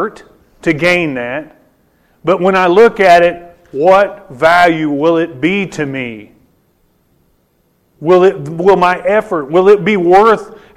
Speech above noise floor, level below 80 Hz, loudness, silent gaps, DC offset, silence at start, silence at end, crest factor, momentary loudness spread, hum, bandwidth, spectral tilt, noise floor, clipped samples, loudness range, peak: 47 dB; -46 dBFS; -11 LUFS; none; under 0.1%; 0 s; 0.3 s; 12 dB; 14 LU; none; 14.5 kHz; -6 dB/octave; -57 dBFS; under 0.1%; 6 LU; 0 dBFS